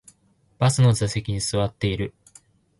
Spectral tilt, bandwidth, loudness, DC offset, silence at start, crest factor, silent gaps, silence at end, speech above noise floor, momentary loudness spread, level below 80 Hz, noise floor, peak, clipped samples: -5.5 dB/octave; 11.5 kHz; -23 LUFS; under 0.1%; 0.6 s; 16 dB; none; 0.7 s; 40 dB; 9 LU; -44 dBFS; -62 dBFS; -8 dBFS; under 0.1%